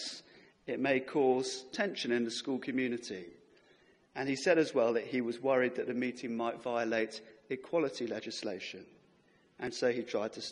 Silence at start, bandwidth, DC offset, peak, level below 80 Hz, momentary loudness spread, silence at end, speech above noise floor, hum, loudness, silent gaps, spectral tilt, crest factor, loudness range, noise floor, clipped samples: 0 s; 11.5 kHz; under 0.1%; -14 dBFS; -78 dBFS; 13 LU; 0 s; 34 dB; none; -34 LUFS; none; -4 dB/octave; 20 dB; 5 LU; -67 dBFS; under 0.1%